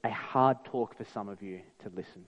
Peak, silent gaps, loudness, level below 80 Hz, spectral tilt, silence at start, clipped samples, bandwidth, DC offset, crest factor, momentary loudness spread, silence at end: -12 dBFS; none; -31 LUFS; -72 dBFS; -8 dB/octave; 0.05 s; under 0.1%; 9.6 kHz; under 0.1%; 22 dB; 18 LU; 0.05 s